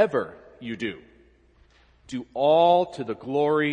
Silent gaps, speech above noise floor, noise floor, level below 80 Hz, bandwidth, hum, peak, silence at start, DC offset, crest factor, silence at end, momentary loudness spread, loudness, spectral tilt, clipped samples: none; 35 dB; -58 dBFS; -62 dBFS; 9.8 kHz; none; -6 dBFS; 0 s; under 0.1%; 18 dB; 0 s; 19 LU; -23 LUFS; -6.5 dB/octave; under 0.1%